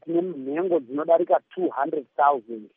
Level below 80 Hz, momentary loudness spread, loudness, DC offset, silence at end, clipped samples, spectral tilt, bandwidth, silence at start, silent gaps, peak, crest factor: -88 dBFS; 8 LU; -24 LUFS; under 0.1%; 0.1 s; under 0.1%; -6 dB/octave; 3.7 kHz; 0.05 s; none; -6 dBFS; 18 dB